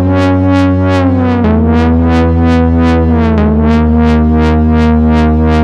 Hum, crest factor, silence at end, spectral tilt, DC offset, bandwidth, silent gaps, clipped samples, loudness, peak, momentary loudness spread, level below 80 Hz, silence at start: none; 8 dB; 0 s; -9 dB/octave; under 0.1%; 7.4 kHz; none; under 0.1%; -9 LUFS; 0 dBFS; 1 LU; -16 dBFS; 0 s